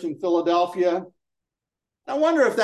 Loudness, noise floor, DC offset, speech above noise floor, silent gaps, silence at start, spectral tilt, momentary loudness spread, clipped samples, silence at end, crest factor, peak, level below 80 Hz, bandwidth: -22 LUFS; -87 dBFS; under 0.1%; 66 dB; none; 0 s; -5 dB/octave; 8 LU; under 0.1%; 0 s; 16 dB; -8 dBFS; -78 dBFS; 12.5 kHz